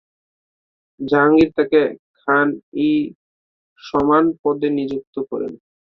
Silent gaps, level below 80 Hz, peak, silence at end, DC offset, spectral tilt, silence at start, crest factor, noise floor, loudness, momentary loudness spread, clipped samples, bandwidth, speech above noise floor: 1.99-2.14 s, 2.63-2.72 s, 3.15-3.76 s, 4.39-4.44 s, 5.07-5.13 s; -52 dBFS; -2 dBFS; 0.35 s; under 0.1%; -8 dB/octave; 1 s; 18 dB; under -90 dBFS; -18 LUFS; 13 LU; under 0.1%; 6.2 kHz; over 73 dB